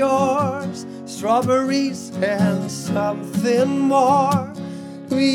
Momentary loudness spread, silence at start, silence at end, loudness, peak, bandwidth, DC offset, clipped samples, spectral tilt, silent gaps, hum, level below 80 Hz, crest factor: 14 LU; 0 s; 0 s; -20 LUFS; -4 dBFS; 16.5 kHz; under 0.1%; under 0.1%; -6 dB/octave; none; none; -66 dBFS; 16 dB